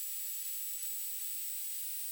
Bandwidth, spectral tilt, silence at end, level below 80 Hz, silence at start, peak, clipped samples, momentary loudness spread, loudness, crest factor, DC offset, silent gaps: over 20 kHz; 10 dB/octave; 0 s; under -90 dBFS; 0 s; -28 dBFS; under 0.1%; 0 LU; -36 LUFS; 12 dB; under 0.1%; none